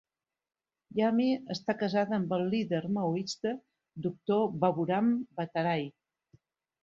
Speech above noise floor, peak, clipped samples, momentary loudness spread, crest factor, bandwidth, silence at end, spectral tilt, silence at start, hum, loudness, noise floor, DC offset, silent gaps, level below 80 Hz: over 60 dB; -14 dBFS; under 0.1%; 9 LU; 16 dB; 7.6 kHz; 0.95 s; -6.5 dB/octave; 0.95 s; none; -31 LUFS; under -90 dBFS; under 0.1%; none; -74 dBFS